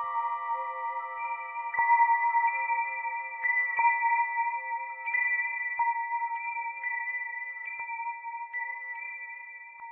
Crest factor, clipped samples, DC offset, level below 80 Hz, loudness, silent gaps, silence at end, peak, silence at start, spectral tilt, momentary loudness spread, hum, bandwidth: 18 dB; under 0.1%; under 0.1%; -84 dBFS; -29 LUFS; none; 0 s; -14 dBFS; 0 s; 3 dB/octave; 12 LU; none; 3.2 kHz